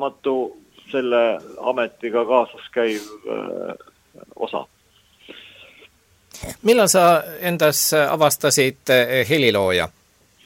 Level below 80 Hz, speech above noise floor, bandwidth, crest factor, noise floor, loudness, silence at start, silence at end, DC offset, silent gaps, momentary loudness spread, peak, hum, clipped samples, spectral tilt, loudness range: -56 dBFS; 37 dB; 16.5 kHz; 20 dB; -56 dBFS; -19 LUFS; 0 s; 0.6 s; under 0.1%; none; 15 LU; -2 dBFS; none; under 0.1%; -3 dB/octave; 15 LU